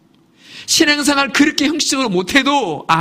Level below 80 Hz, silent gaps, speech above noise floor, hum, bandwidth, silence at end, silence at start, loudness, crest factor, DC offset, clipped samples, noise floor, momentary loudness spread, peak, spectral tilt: -50 dBFS; none; 33 dB; none; 15.5 kHz; 0 s; 0.5 s; -14 LUFS; 16 dB; under 0.1%; under 0.1%; -48 dBFS; 5 LU; 0 dBFS; -2.5 dB/octave